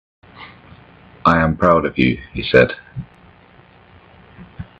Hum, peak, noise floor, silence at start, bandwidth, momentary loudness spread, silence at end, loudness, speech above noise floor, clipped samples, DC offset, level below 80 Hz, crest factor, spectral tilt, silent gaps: none; 0 dBFS; -47 dBFS; 0.4 s; 7.8 kHz; 24 LU; 0.15 s; -16 LUFS; 32 dB; under 0.1%; under 0.1%; -42 dBFS; 20 dB; -8 dB/octave; none